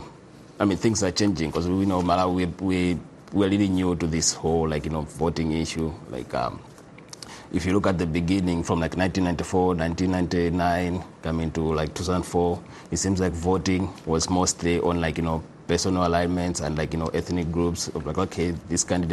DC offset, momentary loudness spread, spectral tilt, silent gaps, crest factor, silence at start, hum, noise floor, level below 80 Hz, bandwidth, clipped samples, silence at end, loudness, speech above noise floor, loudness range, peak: under 0.1%; 8 LU; -5 dB/octave; none; 18 dB; 0 s; none; -46 dBFS; -42 dBFS; 12.5 kHz; under 0.1%; 0 s; -25 LUFS; 22 dB; 3 LU; -6 dBFS